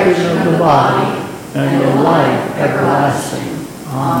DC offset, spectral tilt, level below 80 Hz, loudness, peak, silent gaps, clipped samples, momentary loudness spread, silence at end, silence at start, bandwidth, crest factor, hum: under 0.1%; -6.5 dB/octave; -48 dBFS; -14 LUFS; 0 dBFS; none; under 0.1%; 12 LU; 0 s; 0 s; 17 kHz; 12 dB; none